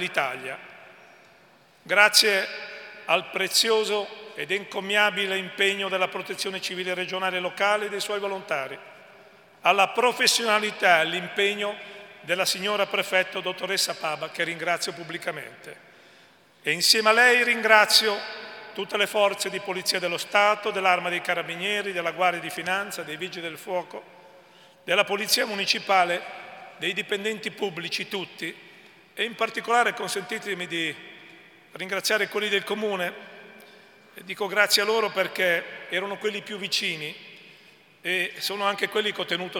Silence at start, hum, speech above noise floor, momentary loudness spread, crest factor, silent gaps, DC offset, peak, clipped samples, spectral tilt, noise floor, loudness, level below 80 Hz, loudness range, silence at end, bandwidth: 0 s; none; 31 dB; 16 LU; 24 dB; none; under 0.1%; -2 dBFS; under 0.1%; -1.5 dB/octave; -56 dBFS; -24 LUFS; -84 dBFS; 8 LU; 0 s; 18 kHz